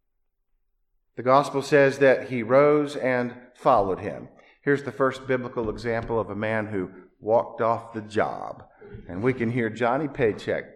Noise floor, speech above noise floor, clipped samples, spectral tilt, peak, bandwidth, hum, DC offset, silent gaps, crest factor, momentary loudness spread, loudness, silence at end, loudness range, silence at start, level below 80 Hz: -73 dBFS; 49 dB; under 0.1%; -6.5 dB/octave; -6 dBFS; 12 kHz; none; under 0.1%; none; 20 dB; 14 LU; -24 LUFS; 0.05 s; 6 LU; 1.2 s; -54 dBFS